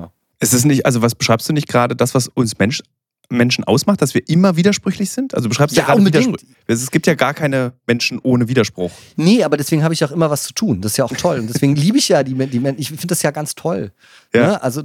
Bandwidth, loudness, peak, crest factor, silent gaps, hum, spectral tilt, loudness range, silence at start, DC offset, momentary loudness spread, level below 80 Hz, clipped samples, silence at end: 17.5 kHz; -16 LUFS; 0 dBFS; 14 dB; none; none; -5 dB/octave; 2 LU; 0 s; under 0.1%; 8 LU; -54 dBFS; under 0.1%; 0 s